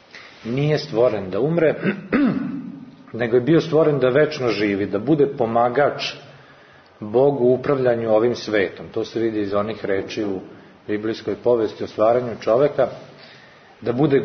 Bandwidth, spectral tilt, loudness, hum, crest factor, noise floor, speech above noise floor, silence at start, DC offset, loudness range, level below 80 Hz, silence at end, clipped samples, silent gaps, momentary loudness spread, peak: 6.6 kHz; -7 dB/octave; -20 LUFS; none; 14 dB; -48 dBFS; 29 dB; 0.15 s; under 0.1%; 4 LU; -58 dBFS; 0 s; under 0.1%; none; 11 LU; -6 dBFS